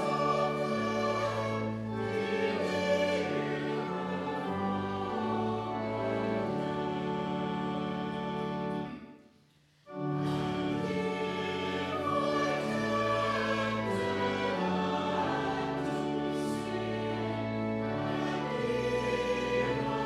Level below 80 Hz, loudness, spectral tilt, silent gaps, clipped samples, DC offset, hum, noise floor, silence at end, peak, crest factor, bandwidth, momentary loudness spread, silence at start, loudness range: -60 dBFS; -32 LUFS; -6 dB/octave; none; under 0.1%; under 0.1%; none; -65 dBFS; 0 s; -16 dBFS; 16 dB; 13.5 kHz; 5 LU; 0 s; 4 LU